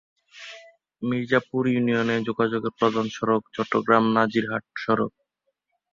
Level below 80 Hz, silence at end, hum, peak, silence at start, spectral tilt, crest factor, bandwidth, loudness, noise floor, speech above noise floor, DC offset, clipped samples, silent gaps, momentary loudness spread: -64 dBFS; 0.85 s; none; -4 dBFS; 0.35 s; -6.5 dB/octave; 22 dB; 7.4 kHz; -24 LUFS; -77 dBFS; 54 dB; under 0.1%; under 0.1%; none; 12 LU